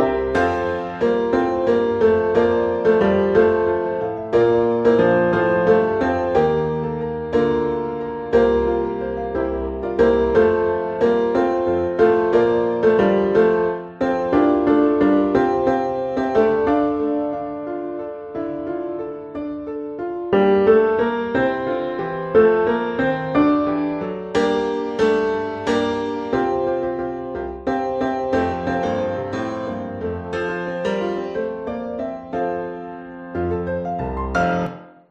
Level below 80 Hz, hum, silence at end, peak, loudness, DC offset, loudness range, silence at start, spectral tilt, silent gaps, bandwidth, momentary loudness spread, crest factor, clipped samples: -44 dBFS; none; 0.2 s; -2 dBFS; -20 LUFS; under 0.1%; 8 LU; 0 s; -7.5 dB/octave; none; 7.8 kHz; 11 LU; 16 dB; under 0.1%